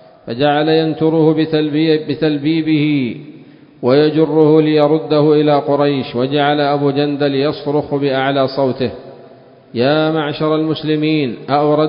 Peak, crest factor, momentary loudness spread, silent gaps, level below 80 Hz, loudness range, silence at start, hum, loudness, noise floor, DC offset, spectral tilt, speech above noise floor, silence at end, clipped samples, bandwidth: 0 dBFS; 14 dB; 6 LU; none; -54 dBFS; 4 LU; 0.25 s; none; -14 LUFS; -41 dBFS; under 0.1%; -10.5 dB/octave; 28 dB; 0 s; under 0.1%; 5.4 kHz